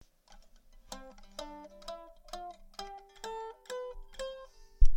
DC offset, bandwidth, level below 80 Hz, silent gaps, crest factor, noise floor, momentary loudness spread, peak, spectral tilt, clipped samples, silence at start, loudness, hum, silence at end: under 0.1%; 8.4 kHz; -34 dBFS; none; 22 dB; -58 dBFS; 12 LU; -8 dBFS; -4.5 dB/octave; under 0.1%; 0.9 s; -44 LUFS; none; 0 s